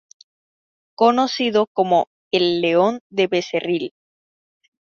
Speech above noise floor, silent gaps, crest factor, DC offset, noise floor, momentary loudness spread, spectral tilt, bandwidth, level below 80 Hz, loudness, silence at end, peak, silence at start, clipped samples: over 72 dB; 1.67-1.75 s, 2.07-2.31 s, 3.01-3.10 s; 18 dB; under 0.1%; under -90 dBFS; 6 LU; -5 dB/octave; 7.2 kHz; -66 dBFS; -19 LUFS; 1.1 s; -2 dBFS; 1 s; under 0.1%